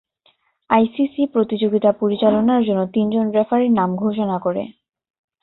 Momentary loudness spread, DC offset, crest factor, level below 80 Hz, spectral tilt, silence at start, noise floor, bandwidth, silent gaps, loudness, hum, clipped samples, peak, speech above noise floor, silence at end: 5 LU; under 0.1%; 18 dB; -60 dBFS; -12 dB/octave; 0.7 s; -61 dBFS; 4.1 kHz; none; -18 LUFS; none; under 0.1%; -2 dBFS; 44 dB; 0.7 s